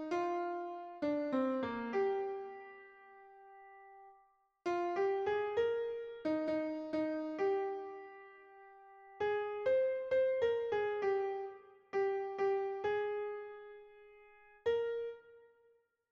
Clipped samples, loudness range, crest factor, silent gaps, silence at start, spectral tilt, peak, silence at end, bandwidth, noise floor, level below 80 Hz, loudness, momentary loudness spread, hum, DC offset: under 0.1%; 5 LU; 14 dB; none; 0 s; -6 dB/octave; -24 dBFS; 0.7 s; 7.2 kHz; -72 dBFS; -76 dBFS; -37 LUFS; 23 LU; none; under 0.1%